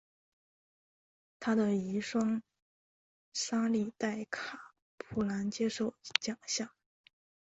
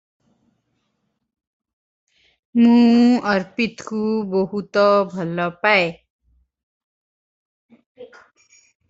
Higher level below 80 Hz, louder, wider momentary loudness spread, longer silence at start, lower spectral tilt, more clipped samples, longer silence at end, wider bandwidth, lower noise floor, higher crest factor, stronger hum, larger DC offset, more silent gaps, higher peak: second, -70 dBFS vs -64 dBFS; second, -35 LUFS vs -18 LUFS; about the same, 9 LU vs 11 LU; second, 1.4 s vs 2.55 s; second, -4 dB/octave vs -6.5 dB/octave; neither; about the same, 0.9 s vs 0.85 s; about the same, 8.2 kHz vs 7.8 kHz; first, under -90 dBFS vs -73 dBFS; first, 30 dB vs 20 dB; neither; neither; second, 2.62-3.32 s, 4.82-4.98 s vs 6.10-6.19 s, 6.63-7.69 s, 7.86-7.95 s; second, -6 dBFS vs -2 dBFS